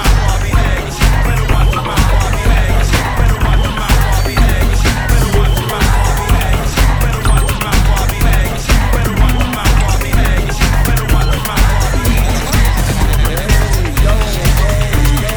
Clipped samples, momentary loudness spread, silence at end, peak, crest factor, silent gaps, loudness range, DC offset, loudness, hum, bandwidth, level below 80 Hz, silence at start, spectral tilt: under 0.1%; 1 LU; 0 s; 0 dBFS; 10 dB; none; 0 LU; 0.3%; -13 LUFS; none; over 20 kHz; -12 dBFS; 0 s; -4.5 dB/octave